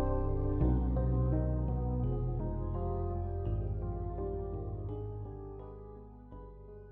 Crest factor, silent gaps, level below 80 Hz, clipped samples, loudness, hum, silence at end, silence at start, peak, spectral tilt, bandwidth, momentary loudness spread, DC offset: 14 dB; none; -38 dBFS; under 0.1%; -35 LUFS; none; 0 s; 0 s; -20 dBFS; -12 dB/octave; 3 kHz; 19 LU; under 0.1%